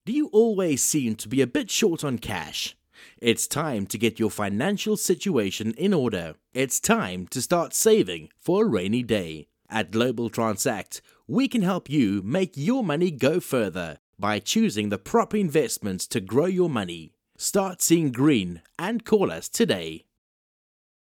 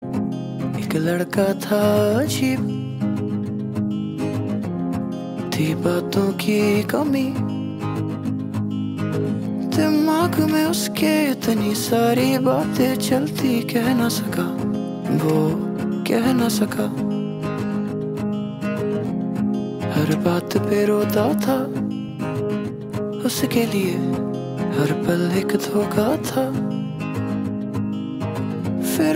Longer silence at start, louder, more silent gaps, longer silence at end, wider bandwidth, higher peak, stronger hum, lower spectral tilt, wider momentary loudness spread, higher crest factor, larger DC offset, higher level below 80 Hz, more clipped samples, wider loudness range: about the same, 0.05 s vs 0 s; about the same, -24 LUFS vs -22 LUFS; first, 13.99-14.13 s vs none; first, 1.2 s vs 0 s; about the same, 18 kHz vs 16.5 kHz; about the same, -6 dBFS vs -4 dBFS; neither; second, -4.5 dB/octave vs -6 dB/octave; about the same, 9 LU vs 7 LU; about the same, 20 dB vs 16 dB; neither; second, -60 dBFS vs -54 dBFS; neither; about the same, 2 LU vs 4 LU